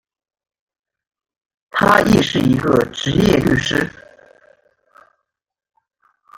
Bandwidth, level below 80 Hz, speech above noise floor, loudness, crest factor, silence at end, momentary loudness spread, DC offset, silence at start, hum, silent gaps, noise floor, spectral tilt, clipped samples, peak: 17 kHz; -42 dBFS; 63 dB; -15 LUFS; 18 dB; 2.5 s; 8 LU; under 0.1%; 1.75 s; none; none; -78 dBFS; -5.5 dB/octave; under 0.1%; 0 dBFS